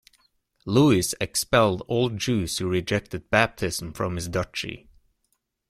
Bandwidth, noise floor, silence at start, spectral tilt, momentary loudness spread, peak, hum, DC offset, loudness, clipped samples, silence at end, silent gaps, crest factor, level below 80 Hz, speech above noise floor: 16 kHz; -74 dBFS; 0.65 s; -4.5 dB/octave; 10 LU; -4 dBFS; none; under 0.1%; -24 LUFS; under 0.1%; 0.9 s; none; 22 dB; -50 dBFS; 50 dB